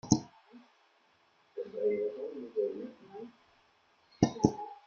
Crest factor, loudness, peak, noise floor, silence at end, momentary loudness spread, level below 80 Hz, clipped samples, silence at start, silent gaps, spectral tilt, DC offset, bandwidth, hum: 28 dB; -34 LUFS; -6 dBFS; -69 dBFS; 0.1 s; 19 LU; -62 dBFS; under 0.1%; 0.05 s; none; -6 dB/octave; under 0.1%; 7.4 kHz; none